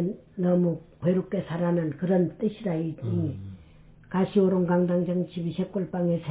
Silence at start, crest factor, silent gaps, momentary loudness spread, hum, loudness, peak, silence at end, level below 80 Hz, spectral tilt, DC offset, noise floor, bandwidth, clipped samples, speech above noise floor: 0 s; 14 dB; none; 8 LU; none; -27 LUFS; -12 dBFS; 0 s; -58 dBFS; -12.5 dB/octave; under 0.1%; -52 dBFS; 4 kHz; under 0.1%; 26 dB